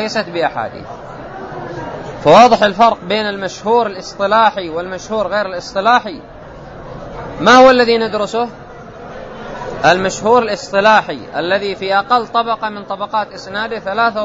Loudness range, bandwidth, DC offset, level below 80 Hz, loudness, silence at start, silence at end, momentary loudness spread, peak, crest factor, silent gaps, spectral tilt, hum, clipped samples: 4 LU; 8 kHz; under 0.1%; -44 dBFS; -14 LUFS; 0 s; 0 s; 21 LU; 0 dBFS; 14 dB; none; -4 dB/octave; none; under 0.1%